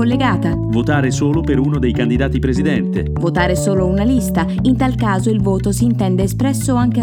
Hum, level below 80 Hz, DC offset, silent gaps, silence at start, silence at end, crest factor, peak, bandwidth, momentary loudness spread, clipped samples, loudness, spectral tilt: none; -28 dBFS; under 0.1%; none; 0 s; 0 s; 14 dB; 0 dBFS; 17.5 kHz; 2 LU; under 0.1%; -16 LUFS; -6.5 dB/octave